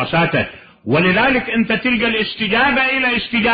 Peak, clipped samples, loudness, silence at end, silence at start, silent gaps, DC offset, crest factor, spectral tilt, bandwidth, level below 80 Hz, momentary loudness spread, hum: -4 dBFS; under 0.1%; -15 LUFS; 0 s; 0 s; none; under 0.1%; 12 dB; -10.5 dB/octave; 5 kHz; -44 dBFS; 6 LU; none